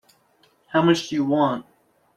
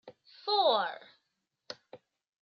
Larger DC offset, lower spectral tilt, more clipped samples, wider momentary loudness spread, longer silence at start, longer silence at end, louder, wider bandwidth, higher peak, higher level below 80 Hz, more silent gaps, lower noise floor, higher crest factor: neither; first, -6 dB/octave vs -3 dB/octave; neither; second, 6 LU vs 21 LU; first, 0.7 s vs 0.05 s; about the same, 0.55 s vs 0.45 s; first, -22 LUFS vs -30 LUFS; first, 12.5 kHz vs 6.8 kHz; first, -6 dBFS vs -14 dBFS; first, -66 dBFS vs under -90 dBFS; neither; second, -61 dBFS vs -83 dBFS; about the same, 18 dB vs 20 dB